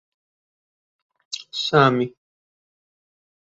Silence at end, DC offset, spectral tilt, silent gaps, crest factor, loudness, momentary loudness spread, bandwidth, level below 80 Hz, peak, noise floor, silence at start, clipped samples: 1.4 s; under 0.1%; -5.5 dB/octave; none; 22 dB; -20 LUFS; 17 LU; 7.8 kHz; -66 dBFS; -2 dBFS; under -90 dBFS; 1.3 s; under 0.1%